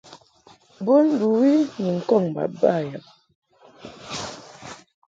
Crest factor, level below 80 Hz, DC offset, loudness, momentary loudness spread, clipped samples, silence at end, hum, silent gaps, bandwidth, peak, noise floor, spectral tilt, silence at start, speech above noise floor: 18 dB; -66 dBFS; under 0.1%; -21 LUFS; 22 LU; under 0.1%; 0.4 s; none; 3.35-3.42 s; 7.8 kHz; -6 dBFS; -54 dBFS; -6.5 dB/octave; 0.1 s; 34 dB